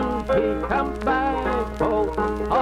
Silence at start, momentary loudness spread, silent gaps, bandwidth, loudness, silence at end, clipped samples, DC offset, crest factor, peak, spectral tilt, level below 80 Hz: 0 s; 2 LU; none; 13.5 kHz; -23 LUFS; 0 s; under 0.1%; under 0.1%; 14 dB; -10 dBFS; -7 dB/octave; -34 dBFS